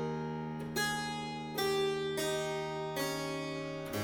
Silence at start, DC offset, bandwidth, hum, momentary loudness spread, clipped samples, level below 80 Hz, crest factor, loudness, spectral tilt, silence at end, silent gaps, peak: 0 s; under 0.1%; over 20 kHz; none; 6 LU; under 0.1%; -64 dBFS; 16 dB; -36 LUFS; -4 dB/octave; 0 s; none; -20 dBFS